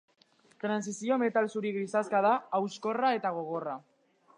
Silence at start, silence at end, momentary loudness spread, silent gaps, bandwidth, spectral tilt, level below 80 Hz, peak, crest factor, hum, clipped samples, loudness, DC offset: 0.65 s; 0.6 s; 9 LU; none; 11 kHz; -5 dB/octave; -88 dBFS; -14 dBFS; 18 dB; none; under 0.1%; -31 LUFS; under 0.1%